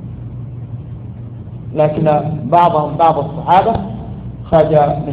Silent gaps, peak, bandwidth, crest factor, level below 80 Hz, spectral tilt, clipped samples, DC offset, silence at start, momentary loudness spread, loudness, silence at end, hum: none; 0 dBFS; 5 kHz; 14 dB; -38 dBFS; -10 dB/octave; under 0.1%; under 0.1%; 0 s; 18 LU; -13 LUFS; 0 s; none